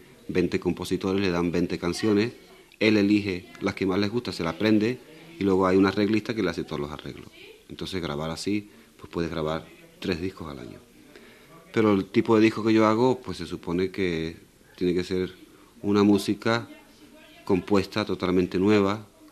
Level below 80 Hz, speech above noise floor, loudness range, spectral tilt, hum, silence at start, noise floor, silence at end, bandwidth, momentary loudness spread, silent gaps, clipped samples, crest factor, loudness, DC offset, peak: -56 dBFS; 26 dB; 8 LU; -6.5 dB/octave; none; 0.3 s; -51 dBFS; 0.25 s; 13.5 kHz; 14 LU; none; under 0.1%; 20 dB; -25 LUFS; under 0.1%; -6 dBFS